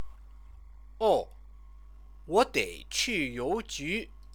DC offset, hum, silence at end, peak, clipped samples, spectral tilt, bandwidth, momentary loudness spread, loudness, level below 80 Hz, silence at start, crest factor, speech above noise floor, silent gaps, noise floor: under 0.1%; none; 0 s; -10 dBFS; under 0.1%; -3 dB/octave; over 20 kHz; 8 LU; -30 LUFS; -50 dBFS; 0 s; 22 dB; 21 dB; none; -50 dBFS